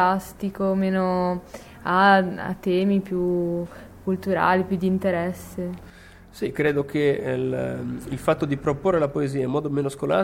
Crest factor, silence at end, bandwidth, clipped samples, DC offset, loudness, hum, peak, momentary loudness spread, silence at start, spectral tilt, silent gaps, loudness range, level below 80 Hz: 18 dB; 0 s; 16.5 kHz; under 0.1%; under 0.1%; -24 LUFS; none; -6 dBFS; 12 LU; 0 s; -7 dB/octave; none; 4 LU; -50 dBFS